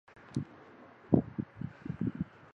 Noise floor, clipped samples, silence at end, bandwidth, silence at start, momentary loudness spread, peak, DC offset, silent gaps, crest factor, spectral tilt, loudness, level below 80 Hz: -55 dBFS; under 0.1%; 0.3 s; 9.6 kHz; 0.15 s; 23 LU; -10 dBFS; under 0.1%; none; 28 dB; -9.5 dB/octave; -36 LUFS; -58 dBFS